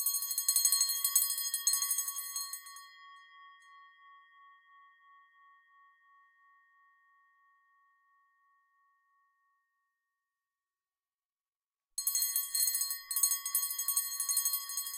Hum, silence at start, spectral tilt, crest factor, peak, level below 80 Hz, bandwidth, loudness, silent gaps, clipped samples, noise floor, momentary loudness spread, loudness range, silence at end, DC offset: none; 0 s; 8.5 dB/octave; 28 dB; -10 dBFS; -88 dBFS; 17 kHz; -30 LUFS; none; under 0.1%; under -90 dBFS; 12 LU; 15 LU; 0 s; under 0.1%